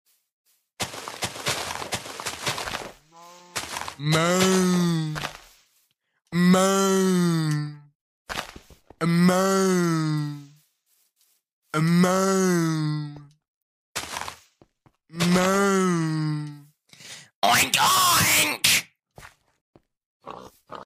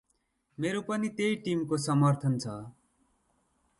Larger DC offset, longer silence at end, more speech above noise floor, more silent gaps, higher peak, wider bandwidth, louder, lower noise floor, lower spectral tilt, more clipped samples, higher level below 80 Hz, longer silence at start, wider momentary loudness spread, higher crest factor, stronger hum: neither; second, 0 s vs 1.1 s; first, 51 dB vs 46 dB; first, 7.95-8.26 s, 11.52-11.62 s, 13.48-13.95 s, 17.35-17.42 s, 19.61-19.73 s, 20.06-20.20 s vs none; first, -6 dBFS vs -14 dBFS; first, 16 kHz vs 11.5 kHz; first, -22 LUFS vs -30 LUFS; second, -71 dBFS vs -76 dBFS; second, -4 dB/octave vs -6.5 dB/octave; neither; first, -58 dBFS vs -68 dBFS; first, 0.8 s vs 0.6 s; first, 18 LU vs 12 LU; about the same, 20 dB vs 18 dB; neither